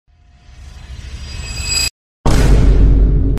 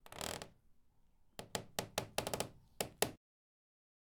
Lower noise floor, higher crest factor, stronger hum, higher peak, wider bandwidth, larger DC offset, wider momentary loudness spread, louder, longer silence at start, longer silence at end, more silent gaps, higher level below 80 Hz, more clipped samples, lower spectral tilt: second, -43 dBFS vs -69 dBFS; second, 12 dB vs 36 dB; neither; first, -2 dBFS vs -10 dBFS; second, 15.5 kHz vs over 20 kHz; neither; first, 19 LU vs 13 LU; first, -15 LUFS vs -42 LUFS; first, 0.6 s vs 0.05 s; second, 0 s vs 1 s; first, 1.90-2.24 s vs none; first, -14 dBFS vs -66 dBFS; neither; first, -4.5 dB/octave vs -2.5 dB/octave